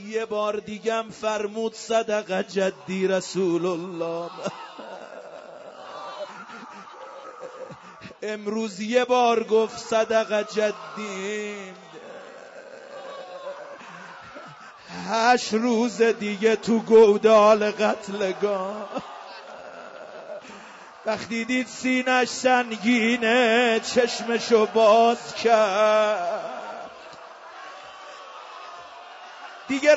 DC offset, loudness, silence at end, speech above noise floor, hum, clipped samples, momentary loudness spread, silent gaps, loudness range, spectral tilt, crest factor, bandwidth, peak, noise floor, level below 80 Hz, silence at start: under 0.1%; -22 LUFS; 0 s; 22 dB; none; under 0.1%; 23 LU; none; 17 LU; -4 dB/octave; 18 dB; 8 kHz; -6 dBFS; -44 dBFS; -70 dBFS; 0 s